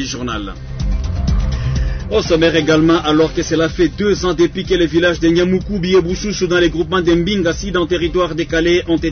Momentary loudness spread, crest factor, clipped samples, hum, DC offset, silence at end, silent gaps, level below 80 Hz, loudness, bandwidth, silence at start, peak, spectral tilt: 8 LU; 12 dB; under 0.1%; none; under 0.1%; 0 s; none; -26 dBFS; -15 LUFS; 6.6 kHz; 0 s; -2 dBFS; -5.5 dB/octave